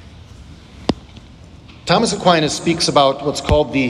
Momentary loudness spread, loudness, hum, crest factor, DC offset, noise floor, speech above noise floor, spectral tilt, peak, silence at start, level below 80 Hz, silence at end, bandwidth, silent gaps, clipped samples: 11 LU; -16 LUFS; none; 18 dB; under 0.1%; -40 dBFS; 25 dB; -4.5 dB/octave; 0 dBFS; 0.05 s; -36 dBFS; 0 s; 13 kHz; none; under 0.1%